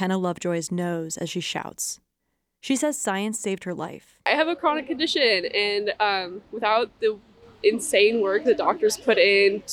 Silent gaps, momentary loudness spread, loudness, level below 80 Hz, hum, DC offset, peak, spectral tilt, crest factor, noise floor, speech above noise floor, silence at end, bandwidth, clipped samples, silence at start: none; 11 LU; -23 LUFS; -64 dBFS; none; under 0.1%; -8 dBFS; -3.5 dB/octave; 16 dB; -77 dBFS; 54 dB; 0 s; 16 kHz; under 0.1%; 0 s